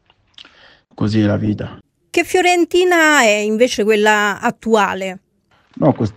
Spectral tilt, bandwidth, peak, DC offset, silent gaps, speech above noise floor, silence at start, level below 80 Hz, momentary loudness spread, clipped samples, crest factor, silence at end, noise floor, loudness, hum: -4.5 dB/octave; 16 kHz; 0 dBFS; under 0.1%; none; 41 dB; 1 s; -52 dBFS; 11 LU; under 0.1%; 16 dB; 0.05 s; -56 dBFS; -15 LUFS; none